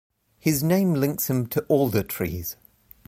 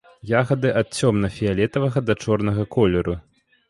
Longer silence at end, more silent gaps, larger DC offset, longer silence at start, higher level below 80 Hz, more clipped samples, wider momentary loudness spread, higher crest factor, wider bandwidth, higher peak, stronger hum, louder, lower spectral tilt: about the same, 0.55 s vs 0.5 s; neither; neither; first, 0.45 s vs 0.25 s; second, -50 dBFS vs -42 dBFS; neither; first, 10 LU vs 3 LU; about the same, 18 dB vs 16 dB; first, 16.5 kHz vs 11.5 kHz; second, -8 dBFS vs -4 dBFS; neither; second, -24 LUFS vs -21 LUFS; about the same, -6 dB/octave vs -6.5 dB/octave